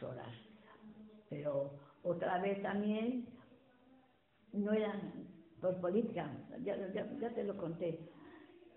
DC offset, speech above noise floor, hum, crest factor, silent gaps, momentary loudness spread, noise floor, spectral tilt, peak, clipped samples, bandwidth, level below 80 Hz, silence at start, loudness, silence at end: under 0.1%; 32 dB; none; 18 dB; none; 21 LU; -71 dBFS; -6 dB/octave; -24 dBFS; under 0.1%; 4 kHz; -78 dBFS; 0 s; -40 LUFS; 0.1 s